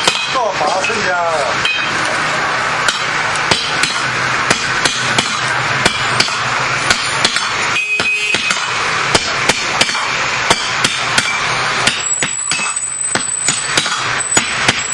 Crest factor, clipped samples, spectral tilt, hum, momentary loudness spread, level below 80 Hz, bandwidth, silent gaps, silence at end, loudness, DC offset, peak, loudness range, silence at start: 16 dB; under 0.1%; -1 dB/octave; none; 2 LU; -46 dBFS; 12 kHz; none; 0 s; -14 LUFS; under 0.1%; 0 dBFS; 1 LU; 0 s